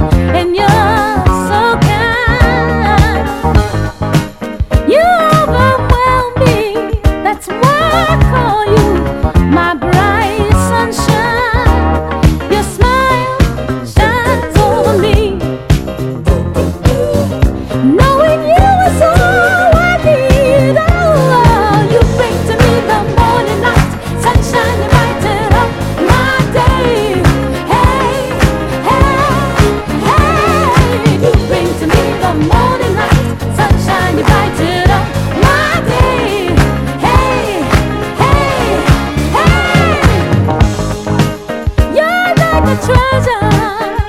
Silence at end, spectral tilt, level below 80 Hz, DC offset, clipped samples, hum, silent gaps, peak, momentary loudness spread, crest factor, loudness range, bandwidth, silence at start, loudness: 0 s; -6 dB/octave; -18 dBFS; under 0.1%; 0.8%; none; none; 0 dBFS; 5 LU; 10 dB; 3 LU; 16 kHz; 0 s; -10 LUFS